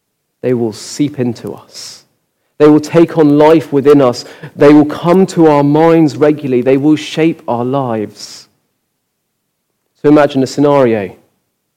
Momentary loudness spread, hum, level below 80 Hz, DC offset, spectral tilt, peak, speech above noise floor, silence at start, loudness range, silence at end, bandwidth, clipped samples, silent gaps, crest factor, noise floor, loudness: 18 LU; none; -52 dBFS; under 0.1%; -7 dB/octave; 0 dBFS; 58 dB; 0.45 s; 7 LU; 0.65 s; 13.5 kHz; under 0.1%; none; 12 dB; -68 dBFS; -10 LUFS